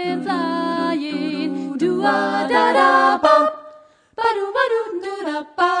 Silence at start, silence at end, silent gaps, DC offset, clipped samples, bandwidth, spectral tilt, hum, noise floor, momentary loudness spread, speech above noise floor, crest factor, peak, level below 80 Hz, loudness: 0 s; 0 s; none; under 0.1%; under 0.1%; 10 kHz; -5 dB/octave; none; -46 dBFS; 12 LU; 28 dB; 18 dB; -2 dBFS; -66 dBFS; -18 LUFS